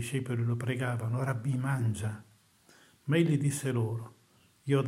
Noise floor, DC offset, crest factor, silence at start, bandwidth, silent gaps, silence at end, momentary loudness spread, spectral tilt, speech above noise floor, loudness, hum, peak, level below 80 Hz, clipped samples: -64 dBFS; under 0.1%; 18 dB; 0 s; 15.5 kHz; none; 0 s; 14 LU; -6.5 dB/octave; 34 dB; -31 LUFS; none; -14 dBFS; -70 dBFS; under 0.1%